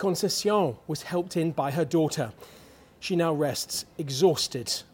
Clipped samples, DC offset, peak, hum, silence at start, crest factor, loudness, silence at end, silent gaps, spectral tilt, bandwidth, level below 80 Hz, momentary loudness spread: under 0.1%; under 0.1%; -10 dBFS; none; 0 s; 18 dB; -27 LUFS; 0.1 s; none; -4.5 dB/octave; 17 kHz; -64 dBFS; 9 LU